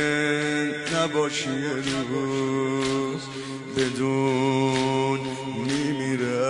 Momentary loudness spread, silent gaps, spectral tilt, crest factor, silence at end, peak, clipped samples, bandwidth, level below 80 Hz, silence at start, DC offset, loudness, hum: 7 LU; none; -5 dB/octave; 14 dB; 0 s; -10 dBFS; under 0.1%; 11 kHz; -58 dBFS; 0 s; under 0.1%; -25 LUFS; none